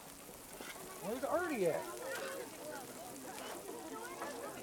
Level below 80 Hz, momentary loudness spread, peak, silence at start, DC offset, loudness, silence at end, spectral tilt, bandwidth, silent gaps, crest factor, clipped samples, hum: -72 dBFS; 11 LU; -22 dBFS; 0 s; under 0.1%; -42 LUFS; 0 s; -3.5 dB/octave; over 20 kHz; none; 20 dB; under 0.1%; none